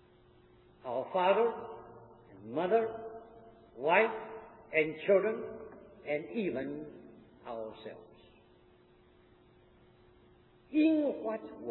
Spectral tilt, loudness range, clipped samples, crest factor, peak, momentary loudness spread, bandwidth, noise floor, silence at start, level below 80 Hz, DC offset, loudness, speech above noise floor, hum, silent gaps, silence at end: -4 dB/octave; 17 LU; under 0.1%; 22 dB; -12 dBFS; 22 LU; 4 kHz; -63 dBFS; 0.85 s; -72 dBFS; under 0.1%; -32 LUFS; 31 dB; none; none; 0 s